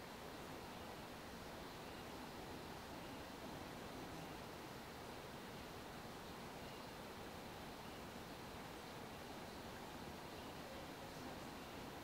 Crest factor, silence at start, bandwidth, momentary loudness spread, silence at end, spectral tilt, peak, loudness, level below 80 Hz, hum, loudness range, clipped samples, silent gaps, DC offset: 14 dB; 0 s; 16 kHz; 1 LU; 0 s; -4 dB/octave; -40 dBFS; -52 LUFS; -68 dBFS; none; 1 LU; under 0.1%; none; under 0.1%